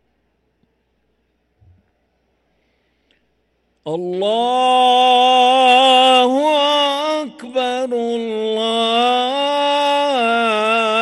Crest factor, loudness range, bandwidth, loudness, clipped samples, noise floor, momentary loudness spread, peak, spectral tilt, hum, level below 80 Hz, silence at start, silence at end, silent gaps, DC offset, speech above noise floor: 16 dB; 10 LU; 12 kHz; -14 LUFS; under 0.1%; -65 dBFS; 11 LU; -2 dBFS; -2.5 dB/octave; none; -66 dBFS; 3.85 s; 0 s; none; under 0.1%; 51 dB